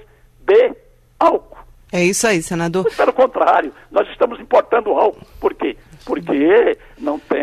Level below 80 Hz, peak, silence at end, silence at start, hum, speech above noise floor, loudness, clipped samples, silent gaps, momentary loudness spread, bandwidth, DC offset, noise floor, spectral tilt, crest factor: -48 dBFS; -2 dBFS; 0 s; 0.45 s; none; 25 dB; -17 LUFS; under 0.1%; none; 11 LU; 13.5 kHz; under 0.1%; -42 dBFS; -4.5 dB/octave; 14 dB